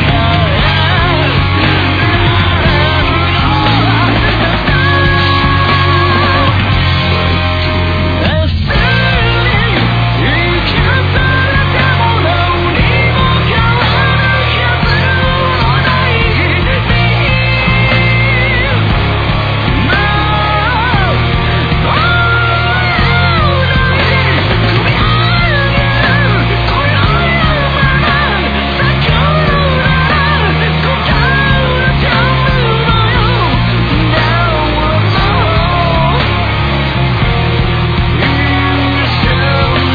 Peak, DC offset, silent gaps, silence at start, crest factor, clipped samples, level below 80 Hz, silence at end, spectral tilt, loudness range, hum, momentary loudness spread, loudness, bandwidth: 0 dBFS; 0.5%; none; 0 s; 10 dB; under 0.1%; -20 dBFS; 0 s; -7.5 dB/octave; 1 LU; none; 2 LU; -10 LUFS; 5 kHz